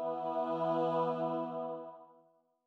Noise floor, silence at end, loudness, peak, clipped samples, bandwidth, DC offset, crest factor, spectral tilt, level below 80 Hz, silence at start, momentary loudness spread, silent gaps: -69 dBFS; 0.55 s; -35 LUFS; -22 dBFS; under 0.1%; 6.6 kHz; under 0.1%; 14 dB; -8.5 dB/octave; under -90 dBFS; 0 s; 11 LU; none